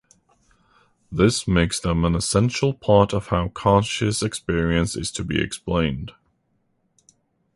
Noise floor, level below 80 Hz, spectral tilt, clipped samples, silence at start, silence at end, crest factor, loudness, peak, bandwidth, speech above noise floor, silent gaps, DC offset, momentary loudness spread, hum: -68 dBFS; -38 dBFS; -5 dB/octave; under 0.1%; 1.1 s; 1.45 s; 20 dB; -21 LUFS; -2 dBFS; 11.5 kHz; 48 dB; none; under 0.1%; 7 LU; none